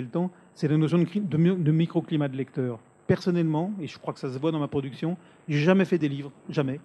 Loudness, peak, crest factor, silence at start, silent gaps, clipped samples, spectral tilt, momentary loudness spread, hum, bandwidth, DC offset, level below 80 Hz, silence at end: -26 LUFS; -6 dBFS; 20 dB; 0 s; none; under 0.1%; -8.5 dB/octave; 11 LU; none; 9 kHz; under 0.1%; -68 dBFS; 0.05 s